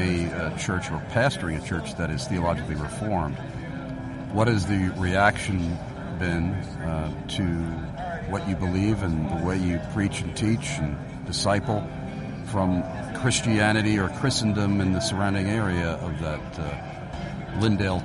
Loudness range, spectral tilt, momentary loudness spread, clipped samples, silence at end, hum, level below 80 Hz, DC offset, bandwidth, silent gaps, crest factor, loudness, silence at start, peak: 4 LU; -5.5 dB/octave; 11 LU; under 0.1%; 0 s; none; -42 dBFS; under 0.1%; 11.5 kHz; none; 20 dB; -26 LUFS; 0 s; -6 dBFS